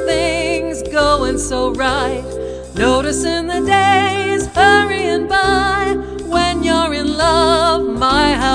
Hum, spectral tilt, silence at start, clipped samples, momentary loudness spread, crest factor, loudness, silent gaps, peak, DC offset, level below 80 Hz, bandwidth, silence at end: none; -4 dB/octave; 0 s; under 0.1%; 8 LU; 14 dB; -15 LUFS; none; 0 dBFS; under 0.1%; -30 dBFS; 10.5 kHz; 0 s